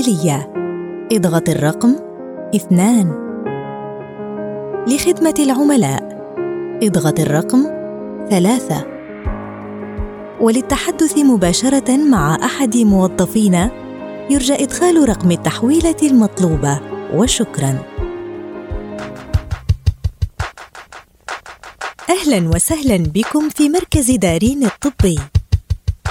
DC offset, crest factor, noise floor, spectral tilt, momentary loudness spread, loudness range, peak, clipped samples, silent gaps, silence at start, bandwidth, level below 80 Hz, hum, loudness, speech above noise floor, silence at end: under 0.1%; 14 dB; -39 dBFS; -5.5 dB/octave; 15 LU; 6 LU; -2 dBFS; under 0.1%; none; 0 s; 17.5 kHz; -30 dBFS; none; -15 LUFS; 25 dB; 0 s